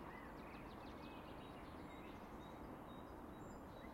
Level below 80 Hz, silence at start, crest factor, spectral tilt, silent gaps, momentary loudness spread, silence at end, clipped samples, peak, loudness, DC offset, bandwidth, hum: -64 dBFS; 0 s; 14 dB; -6 dB/octave; none; 1 LU; 0 s; under 0.1%; -42 dBFS; -55 LUFS; under 0.1%; 16 kHz; none